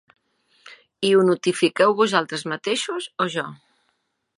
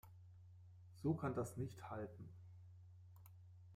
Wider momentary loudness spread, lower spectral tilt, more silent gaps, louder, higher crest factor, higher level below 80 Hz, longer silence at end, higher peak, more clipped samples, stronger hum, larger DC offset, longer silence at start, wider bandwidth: second, 10 LU vs 21 LU; second, -4.5 dB/octave vs -8 dB/octave; neither; first, -21 LUFS vs -47 LUFS; about the same, 20 dB vs 22 dB; about the same, -76 dBFS vs -76 dBFS; first, 0.8 s vs 0 s; first, -2 dBFS vs -28 dBFS; neither; neither; neither; first, 0.65 s vs 0.05 s; second, 11.5 kHz vs 15.5 kHz